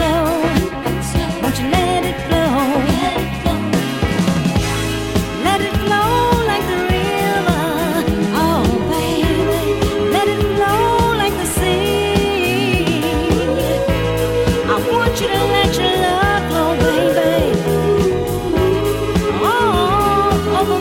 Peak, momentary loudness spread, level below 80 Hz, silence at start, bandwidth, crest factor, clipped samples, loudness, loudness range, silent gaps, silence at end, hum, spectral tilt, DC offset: 0 dBFS; 4 LU; -28 dBFS; 0 s; 17.5 kHz; 16 dB; under 0.1%; -16 LUFS; 2 LU; none; 0 s; none; -5.5 dB/octave; under 0.1%